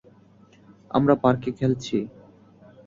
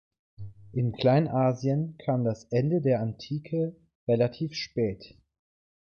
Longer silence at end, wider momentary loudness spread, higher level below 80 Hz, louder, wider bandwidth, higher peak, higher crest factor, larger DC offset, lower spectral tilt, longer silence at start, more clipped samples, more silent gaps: about the same, 0.8 s vs 0.75 s; second, 9 LU vs 13 LU; about the same, -56 dBFS vs -60 dBFS; first, -23 LUFS vs -28 LUFS; about the same, 7.6 kHz vs 7 kHz; first, -4 dBFS vs -10 dBFS; about the same, 20 dB vs 18 dB; neither; about the same, -7.5 dB/octave vs -8 dB/octave; first, 0.95 s vs 0.4 s; neither; second, none vs 3.95-4.07 s